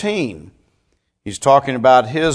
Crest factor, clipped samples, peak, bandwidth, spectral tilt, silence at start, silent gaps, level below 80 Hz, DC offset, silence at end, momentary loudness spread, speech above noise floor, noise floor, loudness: 16 dB; under 0.1%; 0 dBFS; 11 kHz; -5 dB/octave; 0 s; none; -50 dBFS; under 0.1%; 0 s; 17 LU; 51 dB; -66 dBFS; -15 LUFS